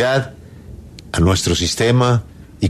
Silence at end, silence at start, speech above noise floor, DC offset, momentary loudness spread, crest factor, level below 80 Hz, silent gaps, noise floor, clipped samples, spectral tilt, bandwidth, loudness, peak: 0 s; 0 s; 21 dB; under 0.1%; 23 LU; 14 dB; -34 dBFS; none; -36 dBFS; under 0.1%; -5 dB/octave; 13.5 kHz; -17 LUFS; -2 dBFS